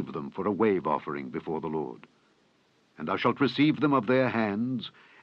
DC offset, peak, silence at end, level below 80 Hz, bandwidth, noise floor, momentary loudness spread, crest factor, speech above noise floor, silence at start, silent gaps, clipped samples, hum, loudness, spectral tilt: under 0.1%; -10 dBFS; 0.35 s; -68 dBFS; 6.6 kHz; -66 dBFS; 12 LU; 18 dB; 39 dB; 0 s; none; under 0.1%; none; -28 LUFS; -8 dB/octave